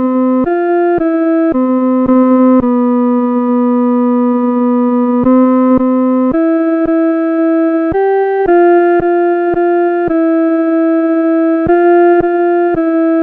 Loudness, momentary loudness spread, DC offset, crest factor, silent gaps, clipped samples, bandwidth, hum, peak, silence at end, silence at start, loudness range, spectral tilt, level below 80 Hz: -11 LUFS; 4 LU; under 0.1%; 10 dB; none; under 0.1%; 3.7 kHz; none; 0 dBFS; 0 s; 0 s; 0 LU; -10 dB/octave; -42 dBFS